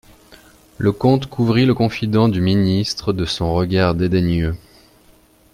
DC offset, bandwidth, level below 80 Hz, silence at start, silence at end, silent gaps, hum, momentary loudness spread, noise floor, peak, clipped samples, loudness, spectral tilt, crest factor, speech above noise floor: under 0.1%; 15.5 kHz; -40 dBFS; 0.3 s; 0.95 s; none; none; 5 LU; -51 dBFS; -2 dBFS; under 0.1%; -18 LUFS; -7 dB/octave; 16 dB; 35 dB